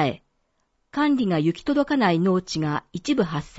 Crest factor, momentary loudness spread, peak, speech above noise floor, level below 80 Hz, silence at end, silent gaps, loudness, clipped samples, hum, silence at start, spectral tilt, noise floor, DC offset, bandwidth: 16 dB; 8 LU; -8 dBFS; 48 dB; -54 dBFS; 0 s; none; -23 LUFS; under 0.1%; none; 0 s; -6.5 dB/octave; -71 dBFS; under 0.1%; 8 kHz